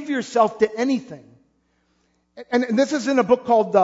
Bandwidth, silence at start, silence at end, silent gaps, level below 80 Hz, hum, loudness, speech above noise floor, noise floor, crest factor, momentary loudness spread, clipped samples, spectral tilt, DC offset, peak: 8 kHz; 0 s; 0 s; none; -66 dBFS; none; -20 LUFS; 46 dB; -66 dBFS; 18 dB; 6 LU; under 0.1%; -5 dB/octave; under 0.1%; -2 dBFS